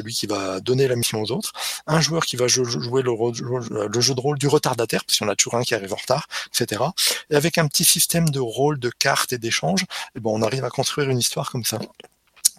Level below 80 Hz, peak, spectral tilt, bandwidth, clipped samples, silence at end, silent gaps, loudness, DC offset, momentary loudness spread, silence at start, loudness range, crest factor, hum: -58 dBFS; 0 dBFS; -3.5 dB/octave; 16.5 kHz; under 0.1%; 0.05 s; none; -21 LUFS; under 0.1%; 7 LU; 0 s; 3 LU; 22 dB; none